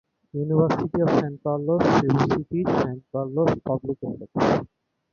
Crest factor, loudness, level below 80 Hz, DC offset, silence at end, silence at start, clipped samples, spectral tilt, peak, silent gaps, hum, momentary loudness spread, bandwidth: 18 dB; -23 LUFS; -52 dBFS; under 0.1%; 0.5 s; 0.35 s; under 0.1%; -8 dB/octave; -6 dBFS; none; none; 11 LU; 7.2 kHz